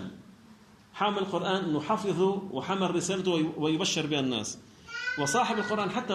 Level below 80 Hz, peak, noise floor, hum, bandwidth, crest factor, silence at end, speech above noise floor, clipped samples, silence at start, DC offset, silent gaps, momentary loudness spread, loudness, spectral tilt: -68 dBFS; -14 dBFS; -55 dBFS; none; 13.5 kHz; 16 dB; 0 s; 26 dB; under 0.1%; 0 s; under 0.1%; none; 8 LU; -29 LUFS; -4 dB/octave